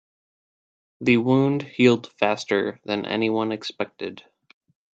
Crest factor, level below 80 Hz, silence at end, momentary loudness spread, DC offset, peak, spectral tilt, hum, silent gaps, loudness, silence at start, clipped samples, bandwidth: 20 dB; -66 dBFS; 0.75 s; 12 LU; under 0.1%; -4 dBFS; -6.5 dB/octave; none; none; -23 LUFS; 1 s; under 0.1%; 8 kHz